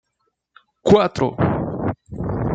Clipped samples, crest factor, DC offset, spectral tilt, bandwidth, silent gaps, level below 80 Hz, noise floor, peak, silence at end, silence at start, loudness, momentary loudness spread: under 0.1%; 18 dB; under 0.1%; -7.5 dB/octave; 7.8 kHz; none; -42 dBFS; -72 dBFS; -2 dBFS; 0 s; 0.85 s; -20 LUFS; 12 LU